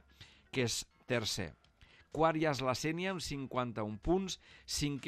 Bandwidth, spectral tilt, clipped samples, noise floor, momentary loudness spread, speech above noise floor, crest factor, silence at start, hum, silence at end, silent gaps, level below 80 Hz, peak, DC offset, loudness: 15 kHz; -4.5 dB/octave; under 0.1%; -64 dBFS; 8 LU; 28 dB; 20 dB; 0.2 s; none; 0 s; none; -56 dBFS; -18 dBFS; under 0.1%; -36 LUFS